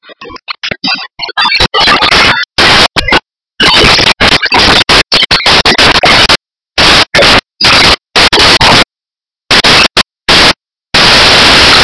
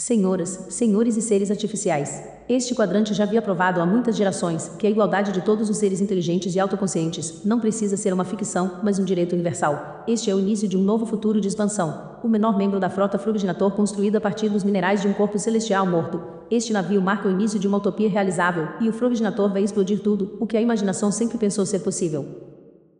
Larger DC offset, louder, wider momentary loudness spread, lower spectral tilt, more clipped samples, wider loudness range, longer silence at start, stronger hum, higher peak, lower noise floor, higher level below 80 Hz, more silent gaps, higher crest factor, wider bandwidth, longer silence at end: neither; first, -4 LUFS vs -22 LUFS; first, 10 LU vs 5 LU; second, -2.5 dB/octave vs -5.5 dB/octave; first, 5% vs under 0.1%; about the same, 2 LU vs 2 LU; about the same, 0.1 s vs 0 s; neither; first, 0 dBFS vs -6 dBFS; first, under -90 dBFS vs -48 dBFS; first, -24 dBFS vs -62 dBFS; neither; second, 6 dB vs 16 dB; about the same, 11 kHz vs 10 kHz; second, 0 s vs 0.45 s